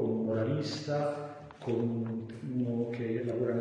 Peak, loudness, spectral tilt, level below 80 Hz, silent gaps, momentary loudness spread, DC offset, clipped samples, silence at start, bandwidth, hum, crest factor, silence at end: -20 dBFS; -34 LUFS; -7.5 dB/octave; -70 dBFS; none; 8 LU; under 0.1%; under 0.1%; 0 s; 9.8 kHz; none; 14 dB; 0 s